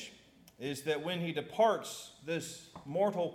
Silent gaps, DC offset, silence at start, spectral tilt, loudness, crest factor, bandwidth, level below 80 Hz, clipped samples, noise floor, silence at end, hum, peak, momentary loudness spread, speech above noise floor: none; under 0.1%; 0 s; -4.5 dB/octave; -35 LUFS; 20 dB; 17 kHz; -76 dBFS; under 0.1%; -60 dBFS; 0 s; none; -16 dBFS; 15 LU; 26 dB